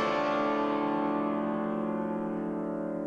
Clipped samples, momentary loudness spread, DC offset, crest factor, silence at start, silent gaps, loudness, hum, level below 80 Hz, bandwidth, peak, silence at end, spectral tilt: under 0.1%; 5 LU; under 0.1%; 14 dB; 0 s; none; -31 LUFS; none; -66 dBFS; 7.8 kHz; -16 dBFS; 0 s; -7 dB/octave